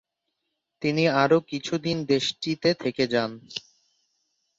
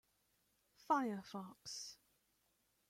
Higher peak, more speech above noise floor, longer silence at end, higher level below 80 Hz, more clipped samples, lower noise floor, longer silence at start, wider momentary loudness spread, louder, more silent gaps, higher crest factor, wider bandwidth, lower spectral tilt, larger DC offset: first, -8 dBFS vs -24 dBFS; first, 56 dB vs 38 dB; about the same, 1 s vs 0.95 s; first, -66 dBFS vs -86 dBFS; neither; about the same, -80 dBFS vs -81 dBFS; about the same, 0.8 s vs 0.9 s; about the same, 11 LU vs 13 LU; first, -25 LUFS vs -43 LUFS; neither; about the same, 20 dB vs 24 dB; second, 7.8 kHz vs 16.5 kHz; about the same, -5 dB/octave vs -4 dB/octave; neither